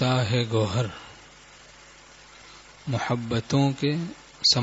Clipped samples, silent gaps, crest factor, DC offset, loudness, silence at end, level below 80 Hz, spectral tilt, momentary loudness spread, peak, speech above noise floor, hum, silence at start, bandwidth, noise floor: under 0.1%; none; 20 dB; under 0.1%; -26 LUFS; 0 s; -56 dBFS; -5 dB/octave; 24 LU; -8 dBFS; 25 dB; none; 0 s; 8 kHz; -50 dBFS